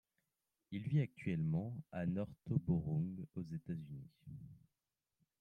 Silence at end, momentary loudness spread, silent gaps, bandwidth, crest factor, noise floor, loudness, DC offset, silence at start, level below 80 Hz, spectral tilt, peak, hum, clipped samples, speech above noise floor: 0.8 s; 17 LU; none; 4.1 kHz; 20 dB; under -90 dBFS; -41 LUFS; under 0.1%; 0.7 s; -68 dBFS; -10 dB/octave; -22 dBFS; none; under 0.1%; over 49 dB